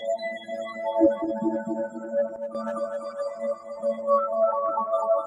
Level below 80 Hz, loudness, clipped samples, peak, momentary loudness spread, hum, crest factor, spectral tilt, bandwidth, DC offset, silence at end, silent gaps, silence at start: -72 dBFS; -27 LUFS; under 0.1%; -8 dBFS; 9 LU; none; 18 dB; -6.5 dB/octave; 10 kHz; under 0.1%; 0 s; none; 0 s